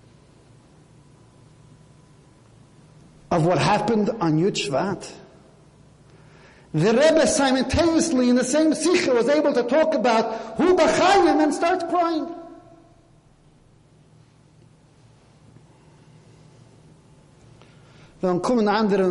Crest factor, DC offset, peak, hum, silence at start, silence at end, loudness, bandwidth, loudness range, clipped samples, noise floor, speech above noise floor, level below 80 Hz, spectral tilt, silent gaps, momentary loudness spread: 16 dB; under 0.1%; -6 dBFS; none; 3.3 s; 0 s; -20 LUFS; 11.5 kHz; 10 LU; under 0.1%; -55 dBFS; 35 dB; -50 dBFS; -5 dB/octave; none; 9 LU